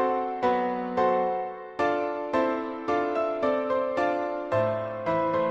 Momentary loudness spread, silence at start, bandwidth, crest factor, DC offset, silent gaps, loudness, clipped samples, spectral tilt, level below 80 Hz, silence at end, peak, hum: 4 LU; 0 s; 7.8 kHz; 14 dB; under 0.1%; none; -27 LUFS; under 0.1%; -7 dB/octave; -62 dBFS; 0 s; -12 dBFS; none